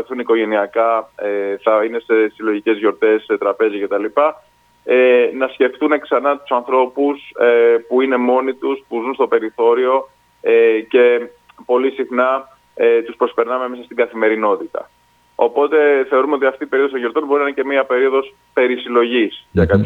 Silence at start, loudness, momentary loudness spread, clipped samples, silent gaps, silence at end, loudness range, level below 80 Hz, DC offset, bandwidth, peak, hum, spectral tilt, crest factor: 0 s; -16 LUFS; 8 LU; under 0.1%; none; 0 s; 2 LU; -48 dBFS; under 0.1%; 4.2 kHz; 0 dBFS; none; -8 dB/octave; 16 dB